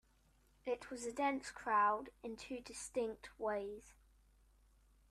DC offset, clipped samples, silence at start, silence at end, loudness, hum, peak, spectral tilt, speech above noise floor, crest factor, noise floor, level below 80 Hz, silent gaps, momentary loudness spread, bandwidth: under 0.1%; under 0.1%; 0.65 s; 1.2 s; -41 LUFS; none; -24 dBFS; -3 dB/octave; 32 dB; 20 dB; -72 dBFS; -70 dBFS; none; 16 LU; 13.5 kHz